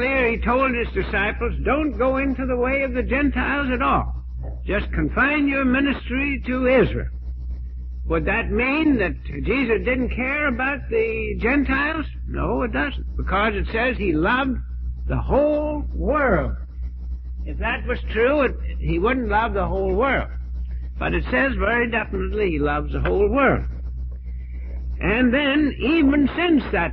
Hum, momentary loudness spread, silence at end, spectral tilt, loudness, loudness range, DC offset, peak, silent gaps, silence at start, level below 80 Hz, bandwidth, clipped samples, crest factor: none; 13 LU; 0 s; -9.5 dB/octave; -21 LUFS; 2 LU; under 0.1%; -6 dBFS; none; 0 s; -28 dBFS; 4.7 kHz; under 0.1%; 16 dB